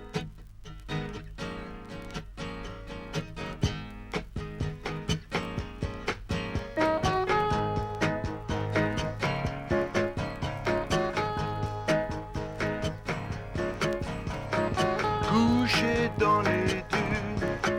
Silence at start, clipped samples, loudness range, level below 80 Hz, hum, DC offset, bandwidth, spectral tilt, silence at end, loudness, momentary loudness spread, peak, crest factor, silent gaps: 0 s; under 0.1%; 10 LU; -44 dBFS; none; under 0.1%; 16.5 kHz; -5.5 dB/octave; 0 s; -30 LUFS; 14 LU; -12 dBFS; 18 dB; none